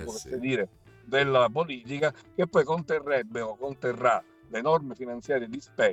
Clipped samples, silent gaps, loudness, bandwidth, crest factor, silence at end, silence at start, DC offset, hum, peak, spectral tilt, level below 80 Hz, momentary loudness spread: under 0.1%; none; -28 LUFS; 13 kHz; 18 dB; 0 s; 0 s; under 0.1%; none; -10 dBFS; -5.5 dB/octave; -62 dBFS; 11 LU